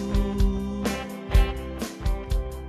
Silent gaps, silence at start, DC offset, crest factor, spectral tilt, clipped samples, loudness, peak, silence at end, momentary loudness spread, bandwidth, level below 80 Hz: none; 0 s; under 0.1%; 16 dB; -6 dB/octave; under 0.1%; -28 LUFS; -8 dBFS; 0 s; 8 LU; 14 kHz; -26 dBFS